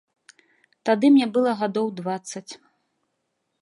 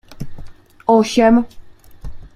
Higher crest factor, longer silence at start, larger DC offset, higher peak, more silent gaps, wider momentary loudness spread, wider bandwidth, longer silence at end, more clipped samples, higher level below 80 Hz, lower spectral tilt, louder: about the same, 18 dB vs 16 dB; first, 0.85 s vs 0.1 s; neither; second, -6 dBFS vs -2 dBFS; neither; second, 19 LU vs 22 LU; second, 11 kHz vs 13.5 kHz; first, 1.05 s vs 0.1 s; neither; second, -78 dBFS vs -38 dBFS; about the same, -5.5 dB/octave vs -5.5 dB/octave; second, -22 LUFS vs -14 LUFS